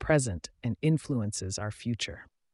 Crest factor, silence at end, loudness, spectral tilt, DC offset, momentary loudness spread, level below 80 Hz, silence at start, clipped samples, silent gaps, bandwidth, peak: 18 dB; 0.3 s; -31 LUFS; -5 dB/octave; under 0.1%; 9 LU; -52 dBFS; 0 s; under 0.1%; none; 11.5 kHz; -14 dBFS